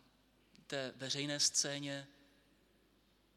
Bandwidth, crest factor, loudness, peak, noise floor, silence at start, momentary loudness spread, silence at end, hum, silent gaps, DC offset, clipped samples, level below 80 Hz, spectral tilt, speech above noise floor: 16 kHz; 22 dB; -37 LUFS; -20 dBFS; -72 dBFS; 0.7 s; 13 LU; 1.25 s; none; none; under 0.1%; under 0.1%; -80 dBFS; -1.5 dB/octave; 33 dB